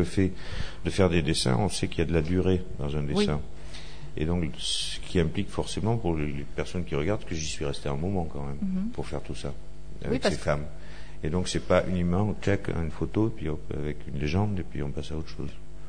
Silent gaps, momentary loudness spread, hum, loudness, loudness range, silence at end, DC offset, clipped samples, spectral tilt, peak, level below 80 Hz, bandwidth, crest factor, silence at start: none; 13 LU; none; -29 LUFS; 5 LU; 0 s; 2%; under 0.1%; -5.5 dB/octave; -10 dBFS; -40 dBFS; 10 kHz; 20 dB; 0 s